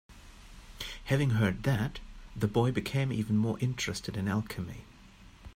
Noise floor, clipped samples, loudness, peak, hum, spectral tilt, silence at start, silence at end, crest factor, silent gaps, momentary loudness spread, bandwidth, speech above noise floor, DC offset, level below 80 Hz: -54 dBFS; under 0.1%; -31 LUFS; -14 dBFS; none; -6 dB/octave; 0.1 s; 0.05 s; 18 dB; none; 14 LU; 16 kHz; 24 dB; under 0.1%; -50 dBFS